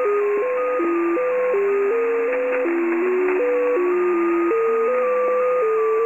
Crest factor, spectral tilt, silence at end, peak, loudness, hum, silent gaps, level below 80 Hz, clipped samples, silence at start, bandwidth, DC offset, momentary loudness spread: 10 dB; -6.5 dB/octave; 0 s; -8 dBFS; -20 LUFS; none; none; -72 dBFS; under 0.1%; 0 s; 8 kHz; 0.1%; 2 LU